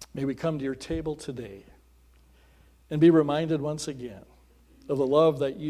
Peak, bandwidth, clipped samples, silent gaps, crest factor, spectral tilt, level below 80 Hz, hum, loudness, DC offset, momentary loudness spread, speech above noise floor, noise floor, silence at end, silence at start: -8 dBFS; 13 kHz; under 0.1%; none; 18 dB; -7 dB/octave; -54 dBFS; none; -26 LUFS; under 0.1%; 19 LU; 32 dB; -58 dBFS; 0 s; 0 s